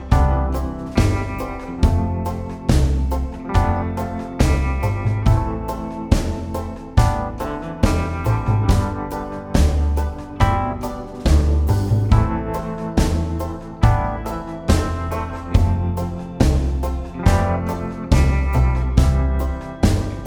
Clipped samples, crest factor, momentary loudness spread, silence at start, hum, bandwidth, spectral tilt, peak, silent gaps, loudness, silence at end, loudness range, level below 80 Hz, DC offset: under 0.1%; 18 dB; 9 LU; 0 s; none; 17 kHz; -7 dB/octave; 0 dBFS; none; -21 LUFS; 0 s; 2 LU; -22 dBFS; under 0.1%